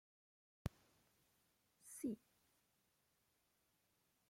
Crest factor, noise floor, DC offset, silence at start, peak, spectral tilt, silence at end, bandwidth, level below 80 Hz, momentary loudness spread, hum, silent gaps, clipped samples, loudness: 30 dB; -83 dBFS; under 0.1%; 0.65 s; -28 dBFS; -6 dB/octave; 2.1 s; 16.5 kHz; -72 dBFS; 10 LU; none; none; under 0.1%; -52 LUFS